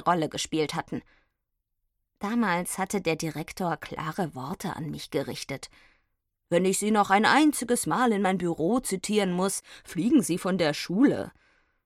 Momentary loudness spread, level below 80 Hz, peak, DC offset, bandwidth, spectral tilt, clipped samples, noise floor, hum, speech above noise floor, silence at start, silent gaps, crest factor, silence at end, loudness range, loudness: 12 LU; -60 dBFS; -8 dBFS; under 0.1%; 16 kHz; -4.5 dB/octave; under 0.1%; -81 dBFS; none; 54 dB; 0 s; none; 20 dB; 0.55 s; 8 LU; -27 LUFS